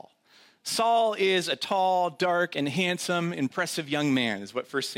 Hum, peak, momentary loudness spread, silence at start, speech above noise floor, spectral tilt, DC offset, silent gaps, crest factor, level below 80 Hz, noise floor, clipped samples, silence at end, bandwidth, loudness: none; -12 dBFS; 7 LU; 0.65 s; 33 dB; -4 dB/octave; under 0.1%; none; 14 dB; -76 dBFS; -59 dBFS; under 0.1%; 0 s; 16.5 kHz; -26 LUFS